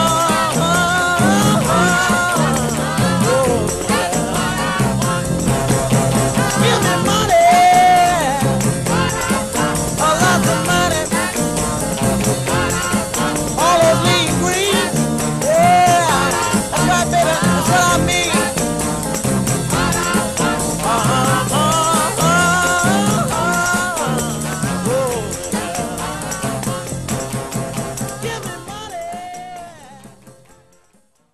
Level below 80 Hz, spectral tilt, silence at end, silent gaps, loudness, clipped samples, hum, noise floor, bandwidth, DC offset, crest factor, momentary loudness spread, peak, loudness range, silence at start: -36 dBFS; -4 dB/octave; 1.05 s; none; -15 LUFS; under 0.1%; none; -57 dBFS; 13 kHz; 0.3%; 14 dB; 10 LU; -2 dBFS; 9 LU; 0 s